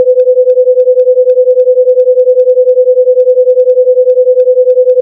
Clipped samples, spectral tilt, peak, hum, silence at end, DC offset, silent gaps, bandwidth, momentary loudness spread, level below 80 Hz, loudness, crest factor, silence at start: 0.6%; -5.5 dB/octave; 0 dBFS; none; 0 s; under 0.1%; none; 0.7 kHz; 0 LU; under -90 dBFS; -7 LUFS; 6 dB; 0 s